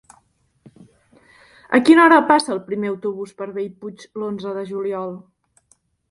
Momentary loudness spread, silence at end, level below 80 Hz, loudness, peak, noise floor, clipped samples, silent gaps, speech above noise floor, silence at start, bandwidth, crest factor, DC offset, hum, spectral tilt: 19 LU; 0.95 s; -66 dBFS; -18 LUFS; 0 dBFS; -62 dBFS; under 0.1%; none; 43 dB; 1.7 s; 11.5 kHz; 20 dB; under 0.1%; none; -5 dB/octave